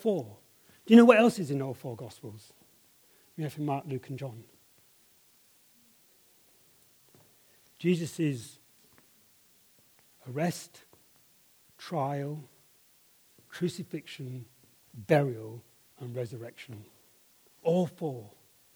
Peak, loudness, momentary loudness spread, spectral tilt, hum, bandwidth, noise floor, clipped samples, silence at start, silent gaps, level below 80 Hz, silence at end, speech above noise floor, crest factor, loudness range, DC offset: -4 dBFS; -29 LUFS; 25 LU; -6.5 dB/octave; none; over 20 kHz; -63 dBFS; under 0.1%; 0 s; none; -80 dBFS; 0.45 s; 35 dB; 28 dB; 15 LU; under 0.1%